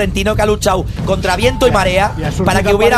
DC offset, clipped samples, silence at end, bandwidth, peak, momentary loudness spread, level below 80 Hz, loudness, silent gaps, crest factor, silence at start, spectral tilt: under 0.1%; under 0.1%; 0 s; 14.5 kHz; 0 dBFS; 5 LU; -24 dBFS; -14 LUFS; none; 12 dB; 0 s; -5 dB/octave